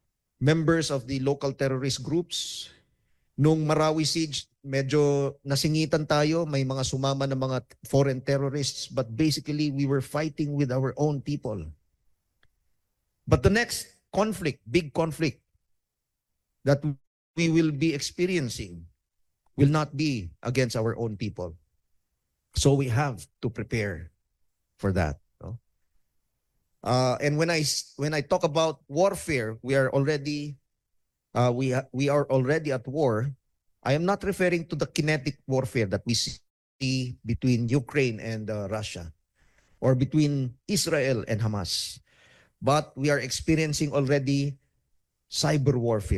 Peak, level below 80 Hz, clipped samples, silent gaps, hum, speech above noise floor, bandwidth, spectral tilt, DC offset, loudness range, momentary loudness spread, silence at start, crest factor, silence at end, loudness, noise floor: -8 dBFS; -48 dBFS; under 0.1%; 17.07-17.34 s, 36.50-36.79 s; none; 57 dB; 13.5 kHz; -5.5 dB/octave; under 0.1%; 4 LU; 10 LU; 0.4 s; 20 dB; 0 s; -27 LUFS; -83 dBFS